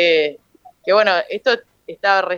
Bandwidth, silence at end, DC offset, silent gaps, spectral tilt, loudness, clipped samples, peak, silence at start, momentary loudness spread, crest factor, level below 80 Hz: 7.2 kHz; 0 s; under 0.1%; none; -3.5 dB/octave; -17 LUFS; under 0.1%; 0 dBFS; 0 s; 11 LU; 18 dB; -70 dBFS